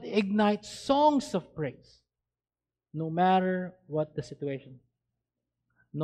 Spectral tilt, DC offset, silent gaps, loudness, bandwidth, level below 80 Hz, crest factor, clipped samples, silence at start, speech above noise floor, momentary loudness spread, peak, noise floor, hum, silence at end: -6.5 dB/octave; under 0.1%; none; -29 LUFS; 11.5 kHz; -66 dBFS; 18 dB; under 0.1%; 0 s; over 61 dB; 13 LU; -12 dBFS; under -90 dBFS; none; 0 s